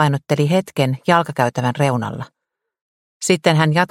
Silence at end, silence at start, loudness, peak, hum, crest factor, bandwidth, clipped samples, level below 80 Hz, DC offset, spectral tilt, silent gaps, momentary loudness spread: 0.05 s; 0 s; -18 LUFS; 0 dBFS; none; 18 dB; 16 kHz; under 0.1%; -58 dBFS; under 0.1%; -5.5 dB/octave; 2.81-3.20 s; 11 LU